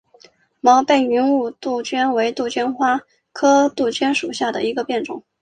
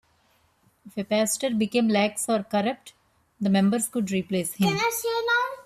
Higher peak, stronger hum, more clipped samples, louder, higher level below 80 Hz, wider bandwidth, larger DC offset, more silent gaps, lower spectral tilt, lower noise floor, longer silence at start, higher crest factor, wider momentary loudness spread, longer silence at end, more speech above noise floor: first, -2 dBFS vs -12 dBFS; neither; neither; first, -18 LUFS vs -25 LUFS; about the same, -64 dBFS vs -66 dBFS; second, 9.4 kHz vs 14.5 kHz; neither; neither; second, -3 dB/octave vs -4.5 dB/octave; second, -52 dBFS vs -65 dBFS; second, 0.65 s vs 0.85 s; about the same, 16 dB vs 14 dB; about the same, 9 LU vs 8 LU; first, 0.2 s vs 0.05 s; second, 34 dB vs 40 dB